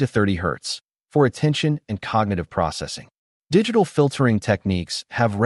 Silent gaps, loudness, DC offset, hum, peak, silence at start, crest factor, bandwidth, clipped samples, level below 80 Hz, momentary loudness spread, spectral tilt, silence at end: 0.84-0.88 s, 3.18-3.41 s; -22 LUFS; under 0.1%; none; -4 dBFS; 0 s; 16 dB; 11.5 kHz; under 0.1%; -48 dBFS; 10 LU; -6 dB/octave; 0 s